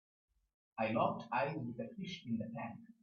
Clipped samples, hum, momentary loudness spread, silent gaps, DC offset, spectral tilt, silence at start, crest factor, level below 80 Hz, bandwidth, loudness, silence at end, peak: under 0.1%; none; 11 LU; none; under 0.1%; -5 dB/octave; 0.75 s; 20 dB; -76 dBFS; 6.8 kHz; -40 LUFS; 0.1 s; -22 dBFS